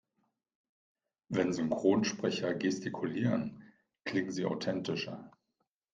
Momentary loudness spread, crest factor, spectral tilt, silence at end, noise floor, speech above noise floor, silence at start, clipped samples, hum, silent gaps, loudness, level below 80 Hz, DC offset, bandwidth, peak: 9 LU; 22 dB; -5.5 dB/octave; 0.65 s; -83 dBFS; 50 dB; 1.3 s; under 0.1%; none; none; -34 LUFS; -74 dBFS; under 0.1%; 9.2 kHz; -14 dBFS